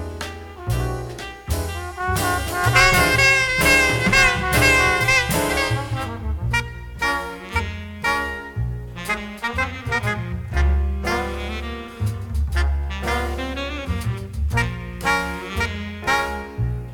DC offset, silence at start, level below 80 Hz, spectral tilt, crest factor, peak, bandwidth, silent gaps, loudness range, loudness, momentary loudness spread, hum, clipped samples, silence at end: under 0.1%; 0 s; -28 dBFS; -4 dB/octave; 20 dB; -2 dBFS; 19.5 kHz; none; 10 LU; -20 LUFS; 14 LU; none; under 0.1%; 0 s